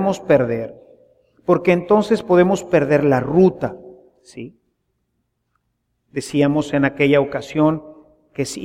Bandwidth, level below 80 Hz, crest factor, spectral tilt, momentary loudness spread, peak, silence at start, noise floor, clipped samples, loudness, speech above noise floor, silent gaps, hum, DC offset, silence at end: 14.5 kHz; -52 dBFS; 16 dB; -6.5 dB/octave; 16 LU; -2 dBFS; 0 s; -71 dBFS; under 0.1%; -17 LUFS; 54 dB; none; none; under 0.1%; 0 s